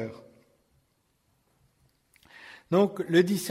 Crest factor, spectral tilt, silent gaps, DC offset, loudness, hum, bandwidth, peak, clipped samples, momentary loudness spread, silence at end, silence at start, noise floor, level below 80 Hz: 22 dB; -5.5 dB/octave; none; under 0.1%; -25 LUFS; none; 16 kHz; -10 dBFS; under 0.1%; 24 LU; 0 s; 0 s; -72 dBFS; -74 dBFS